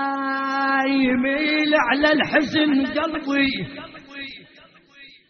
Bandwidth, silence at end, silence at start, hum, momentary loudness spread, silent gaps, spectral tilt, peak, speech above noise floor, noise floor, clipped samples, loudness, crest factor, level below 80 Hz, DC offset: 6.6 kHz; 0.25 s; 0 s; none; 17 LU; none; -2 dB/octave; -4 dBFS; 31 dB; -51 dBFS; under 0.1%; -20 LUFS; 18 dB; -54 dBFS; under 0.1%